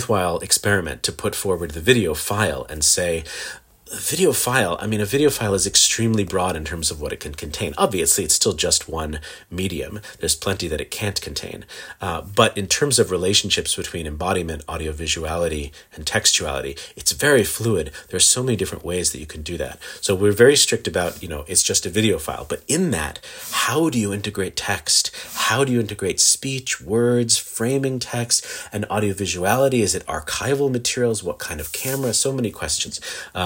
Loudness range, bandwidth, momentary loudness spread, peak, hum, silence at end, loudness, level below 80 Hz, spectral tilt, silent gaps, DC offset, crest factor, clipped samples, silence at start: 3 LU; 17 kHz; 13 LU; 0 dBFS; none; 0 s; -20 LUFS; -44 dBFS; -3 dB/octave; none; under 0.1%; 20 dB; under 0.1%; 0 s